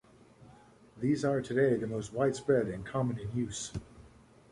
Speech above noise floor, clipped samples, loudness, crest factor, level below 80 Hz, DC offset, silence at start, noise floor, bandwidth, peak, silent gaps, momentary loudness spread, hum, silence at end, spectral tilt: 27 dB; under 0.1%; -32 LUFS; 18 dB; -58 dBFS; under 0.1%; 0.45 s; -58 dBFS; 11.5 kHz; -14 dBFS; none; 8 LU; none; 0.45 s; -6 dB/octave